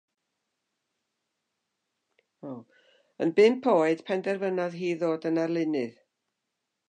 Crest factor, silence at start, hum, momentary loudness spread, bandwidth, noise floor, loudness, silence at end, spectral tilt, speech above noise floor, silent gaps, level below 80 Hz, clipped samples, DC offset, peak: 20 dB; 2.45 s; none; 21 LU; 9.2 kHz; -83 dBFS; -26 LUFS; 1 s; -6.5 dB/octave; 57 dB; none; -86 dBFS; under 0.1%; under 0.1%; -10 dBFS